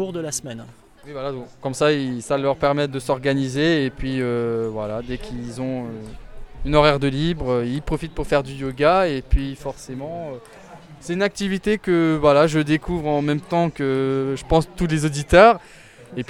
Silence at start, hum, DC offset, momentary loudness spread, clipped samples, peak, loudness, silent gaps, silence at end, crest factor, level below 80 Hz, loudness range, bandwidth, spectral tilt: 0 s; none; under 0.1%; 15 LU; under 0.1%; -2 dBFS; -21 LUFS; none; 0.05 s; 20 dB; -34 dBFS; 5 LU; 15 kHz; -6 dB/octave